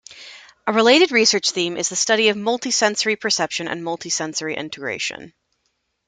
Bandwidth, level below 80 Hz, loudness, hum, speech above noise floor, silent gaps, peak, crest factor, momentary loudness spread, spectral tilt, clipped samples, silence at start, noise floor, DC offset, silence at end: 11 kHz; -66 dBFS; -19 LUFS; none; 52 dB; none; 0 dBFS; 20 dB; 13 LU; -1.5 dB/octave; under 0.1%; 0.1 s; -71 dBFS; under 0.1%; 0.8 s